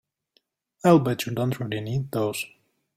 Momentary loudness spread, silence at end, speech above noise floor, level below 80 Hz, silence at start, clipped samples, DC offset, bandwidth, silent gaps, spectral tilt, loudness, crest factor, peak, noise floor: 11 LU; 0.5 s; 46 dB; -62 dBFS; 0.85 s; under 0.1%; under 0.1%; 16.5 kHz; none; -6.5 dB/octave; -24 LUFS; 20 dB; -6 dBFS; -69 dBFS